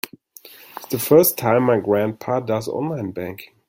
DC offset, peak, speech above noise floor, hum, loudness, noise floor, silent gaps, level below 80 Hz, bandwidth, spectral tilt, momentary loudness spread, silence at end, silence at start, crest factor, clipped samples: under 0.1%; -2 dBFS; 26 dB; none; -19 LUFS; -45 dBFS; none; -60 dBFS; 17 kHz; -5.5 dB/octave; 18 LU; 0.25 s; 0.05 s; 18 dB; under 0.1%